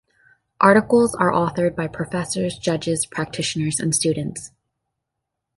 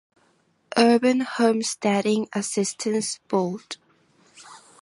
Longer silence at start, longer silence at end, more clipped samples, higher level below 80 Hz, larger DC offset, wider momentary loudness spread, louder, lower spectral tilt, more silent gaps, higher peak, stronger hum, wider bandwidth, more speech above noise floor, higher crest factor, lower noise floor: second, 0.6 s vs 0.75 s; first, 1.1 s vs 0.25 s; neither; first, -54 dBFS vs -74 dBFS; neither; about the same, 11 LU vs 11 LU; first, -20 LUFS vs -23 LUFS; about the same, -4.5 dB/octave vs -4 dB/octave; neither; first, 0 dBFS vs -4 dBFS; neither; about the same, 12 kHz vs 11.5 kHz; first, 61 dB vs 42 dB; about the same, 20 dB vs 20 dB; first, -81 dBFS vs -64 dBFS